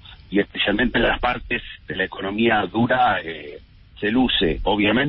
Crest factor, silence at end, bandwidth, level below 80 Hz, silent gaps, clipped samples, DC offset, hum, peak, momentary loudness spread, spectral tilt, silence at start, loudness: 14 dB; 0 s; 5.6 kHz; -38 dBFS; none; under 0.1%; under 0.1%; none; -8 dBFS; 9 LU; -10 dB/octave; 0.05 s; -21 LUFS